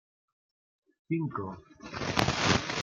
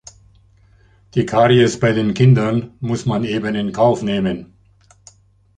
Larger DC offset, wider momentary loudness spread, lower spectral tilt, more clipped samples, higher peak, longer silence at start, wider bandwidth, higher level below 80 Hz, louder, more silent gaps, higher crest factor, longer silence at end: neither; first, 16 LU vs 10 LU; second, -4 dB/octave vs -6.5 dB/octave; neither; about the same, -2 dBFS vs -2 dBFS; about the same, 1.1 s vs 1.15 s; first, 16 kHz vs 9.4 kHz; second, -54 dBFS vs -48 dBFS; second, -30 LUFS vs -17 LUFS; neither; first, 30 dB vs 16 dB; second, 0 s vs 1.15 s